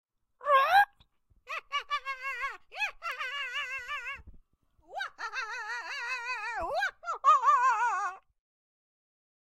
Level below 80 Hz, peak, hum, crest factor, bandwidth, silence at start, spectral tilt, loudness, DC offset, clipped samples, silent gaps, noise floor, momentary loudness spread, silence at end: -64 dBFS; -12 dBFS; none; 20 dB; 16 kHz; 0.4 s; -0.5 dB/octave; -30 LUFS; under 0.1%; under 0.1%; none; -66 dBFS; 15 LU; 1.3 s